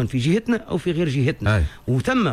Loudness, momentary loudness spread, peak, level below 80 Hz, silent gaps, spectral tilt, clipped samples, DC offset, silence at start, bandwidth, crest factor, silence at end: -22 LUFS; 3 LU; -8 dBFS; -34 dBFS; none; -7 dB/octave; under 0.1%; under 0.1%; 0 s; 13 kHz; 12 dB; 0 s